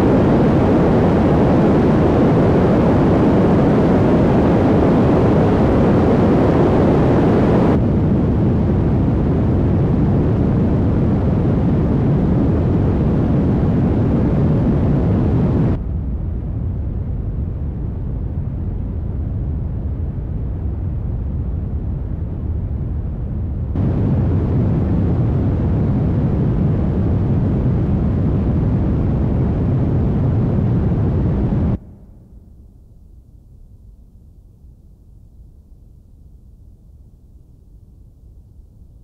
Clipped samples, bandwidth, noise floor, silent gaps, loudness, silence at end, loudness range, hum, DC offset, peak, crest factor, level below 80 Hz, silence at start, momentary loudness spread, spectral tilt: under 0.1%; 7.2 kHz; -44 dBFS; none; -17 LUFS; 0.45 s; 10 LU; none; under 0.1%; -4 dBFS; 12 dB; -26 dBFS; 0 s; 10 LU; -10.5 dB/octave